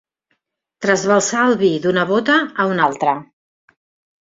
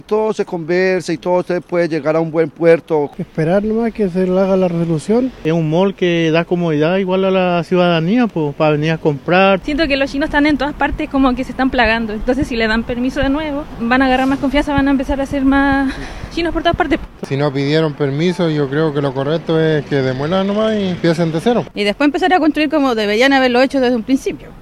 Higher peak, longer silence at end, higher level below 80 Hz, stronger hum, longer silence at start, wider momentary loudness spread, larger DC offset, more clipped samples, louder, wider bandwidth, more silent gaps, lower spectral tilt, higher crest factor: about the same, -2 dBFS vs 0 dBFS; first, 1 s vs 0 s; second, -62 dBFS vs -34 dBFS; neither; first, 0.8 s vs 0.1 s; about the same, 5 LU vs 6 LU; second, under 0.1% vs 0.1%; neither; about the same, -16 LUFS vs -15 LUFS; second, 7.8 kHz vs 12.5 kHz; neither; second, -4 dB/octave vs -6.5 dB/octave; about the same, 16 dB vs 14 dB